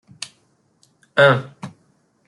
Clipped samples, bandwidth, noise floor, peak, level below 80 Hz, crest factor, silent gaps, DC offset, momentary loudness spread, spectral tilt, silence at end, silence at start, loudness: under 0.1%; 11.5 kHz; -62 dBFS; -2 dBFS; -64 dBFS; 20 dB; none; under 0.1%; 24 LU; -5 dB/octave; 0.6 s; 1.15 s; -16 LUFS